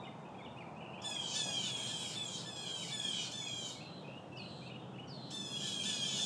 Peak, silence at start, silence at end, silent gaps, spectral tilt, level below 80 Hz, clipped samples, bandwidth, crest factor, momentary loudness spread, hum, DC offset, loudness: -26 dBFS; 0 s; 0 s; none; -2 dB/octave; -78 dBFS; under 0.1%; 11 kHz; 18 dB; 13 LU; none; under 0.1%; -40 LUFS